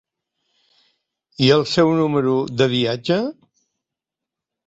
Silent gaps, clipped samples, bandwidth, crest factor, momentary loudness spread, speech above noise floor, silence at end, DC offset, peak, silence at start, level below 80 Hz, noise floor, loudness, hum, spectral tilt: none; under 0.1%; 8 kHz; 20 dB; 6 LU; 68 dB; 1.35 s; under 0.1%; -2 dBFS; 1.4 s; -58 dBFS; -86 dBFS; -18 LUFS; none; -6 dB/octave